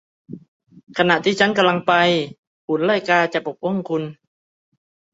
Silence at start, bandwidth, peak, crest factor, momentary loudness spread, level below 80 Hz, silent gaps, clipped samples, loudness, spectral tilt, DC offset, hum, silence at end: 0.3 s; 8 kHz; -2 dBFS; 20 dB; 13 LU; -66 dBFS; 0.48-0.60 s, 0.83-0.87 s, 2.38-2.68 s; under 0.1%; -18 LUFS; -5 dB/octave; under 0.1%; none; 1 s